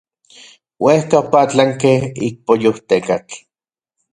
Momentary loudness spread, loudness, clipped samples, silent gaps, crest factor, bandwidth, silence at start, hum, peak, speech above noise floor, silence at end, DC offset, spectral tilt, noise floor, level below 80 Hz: 10 LU; -15 LUFS; under 0.1%; none; 16 dB; 11 kHz; 0.8 s; none; 0 dBFS; 76 dB; 0.75 s; under 0.1%; -6 dB/octave; -90 dBFS; -54 dBFS